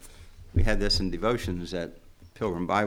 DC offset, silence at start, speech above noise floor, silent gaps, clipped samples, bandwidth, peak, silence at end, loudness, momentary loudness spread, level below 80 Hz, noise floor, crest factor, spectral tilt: under 0.1%; 0 s; 20 dB; none; under 0.1%; 14.5 kHz; -10 dBFS; 0 s; -29 LUFS; 9 LU; -34 dBFS; -47 dBFS; 18 dB; -5.5 dB/octave